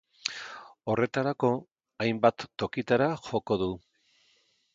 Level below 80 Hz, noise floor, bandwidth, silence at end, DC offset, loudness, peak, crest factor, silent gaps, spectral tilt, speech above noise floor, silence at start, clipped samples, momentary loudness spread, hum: -62 dBFS; -68 dBFS; 7.8 kHz; 1 s; under 0.1%; -29 LUFS; -6 dBFS; 24 dB; none; -6 dB/octave; 41 dB; 0.25 s; under 0.1%; 11 LU; none